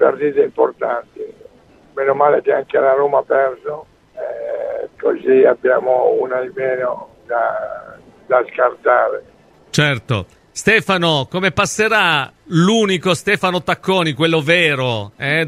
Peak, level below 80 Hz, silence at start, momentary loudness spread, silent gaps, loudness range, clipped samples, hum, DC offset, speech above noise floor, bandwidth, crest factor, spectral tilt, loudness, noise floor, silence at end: 0 dBFS; -54 dBFS; 0 s; 13 LU; none; 3 LU; under 0.1%; none; under 0.1%; 32 dB; 15 kHz; 16 dB; -4.5 dB/octave; -16 LUFS; -48 dBFS; 0 s